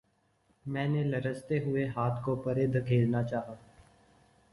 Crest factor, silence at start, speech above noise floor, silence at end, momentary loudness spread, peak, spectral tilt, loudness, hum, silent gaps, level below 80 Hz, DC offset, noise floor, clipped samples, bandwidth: 16 dB; 0.65 s; 41 dB; 0.95 s; 10 LU; -16 dBFS; -9 dB/octave; -31 LUFS; none; none; -60 dBFS; under 0.1%; -71 dBFS; under 0.1%; 11.5 kHz